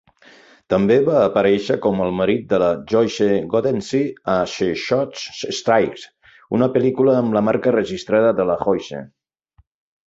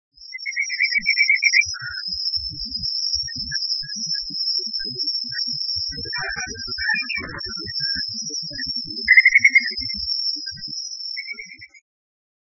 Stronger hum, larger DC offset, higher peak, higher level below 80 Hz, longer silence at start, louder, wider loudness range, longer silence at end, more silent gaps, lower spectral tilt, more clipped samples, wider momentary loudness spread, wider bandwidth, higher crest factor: neither; neither; about the same, -2 dBFS vs -2 dBFS; about the same, -52 dBFS vs -50 dBFS; first, 0.7 s vs 0.2 s; about the same, -18 LUFS vs -20 LUFS; second, 3 LU vs 6 LU; first, 1 s vs 0.75 s; neither; first, -6 dB/octave vs 0 dB/octave; neither; second, 8 LU vs 14 LU; first, 8 kHz vs 7 kHz; second, 16 dB vs 22 dB